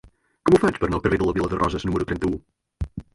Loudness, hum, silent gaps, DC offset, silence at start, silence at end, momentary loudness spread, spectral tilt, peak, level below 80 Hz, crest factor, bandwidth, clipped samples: -22 LUFS; none; none; under 0.1%; 0.45 s; 0.1 s; 16 LU; -7 dB/octave; -4 dBFS; -38 dBFS; 20 dB; 11.5 kHz; under 0.1%